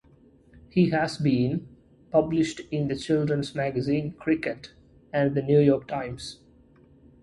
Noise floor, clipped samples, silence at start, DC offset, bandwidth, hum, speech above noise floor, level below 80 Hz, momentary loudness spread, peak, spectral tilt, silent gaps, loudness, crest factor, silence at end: -57 dBFS; under 0.1%; 0.75 s; under 0.1%; 11.5 kHz; none; 32 dB; -56 dBFS; 12 LU; -8 dBFS; -7 dB/octave; none; -26 LUFS; 18 dB; 0.9 s